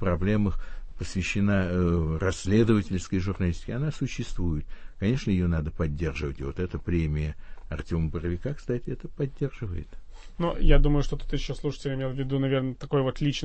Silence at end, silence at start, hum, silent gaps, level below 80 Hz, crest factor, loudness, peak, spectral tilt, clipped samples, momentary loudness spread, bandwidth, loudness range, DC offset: 0 s; 0 s; none; none; -32 dBFS; 20 dB; -28 LUFS; -6 dBFS; -7 dB/octave; under 0.1%; 11 LU; 8.6 kHz; 5 LU; under 0.1%